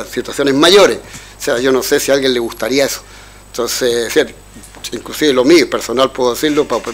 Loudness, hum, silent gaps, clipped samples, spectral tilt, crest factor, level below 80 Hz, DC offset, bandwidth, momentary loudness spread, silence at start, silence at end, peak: -13 LUFS; none; none; under 0.1%; -3 dB/octave; 14 dB; -42 dBFS; under 0.1%; 16.5 kHz; 15 LU; 0 s; 0 s; 0 dBFS